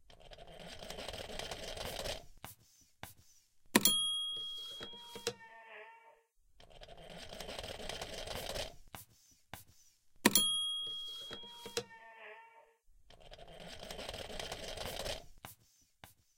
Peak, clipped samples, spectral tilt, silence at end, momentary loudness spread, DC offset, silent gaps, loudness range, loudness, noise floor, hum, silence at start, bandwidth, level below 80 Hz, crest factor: -8 dBFS; under 0.1%; -1.5 dB/octave; 0.25 s; 25 LU; under 0.1%; none; 12 LU; -37 LUFS; -70 dBFS; none; 0 s; 16.5 kHz; -58 dBFS; 34 dB